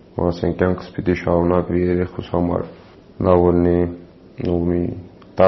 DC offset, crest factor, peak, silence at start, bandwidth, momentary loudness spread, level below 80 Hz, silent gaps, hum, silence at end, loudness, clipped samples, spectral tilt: under 0.1%; 18 dB; 0 dBFS; 0.15 s; 6 kHz; 12 LU; -40 dBFS; none; none; 0 s; -19 LUFS; under 0.1%; -8 dB/octave